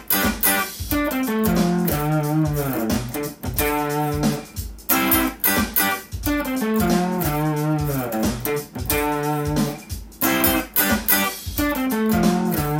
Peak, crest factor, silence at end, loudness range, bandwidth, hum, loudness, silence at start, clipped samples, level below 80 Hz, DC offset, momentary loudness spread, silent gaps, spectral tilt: -2 dBFS; 18 dB; 0 s; 2 LU; 17 kHz; none; -21 LUFS; 0 s; under 0.1%; -38 dBFS; under 0.1%; 8 LU; none; -4.5 dB/octave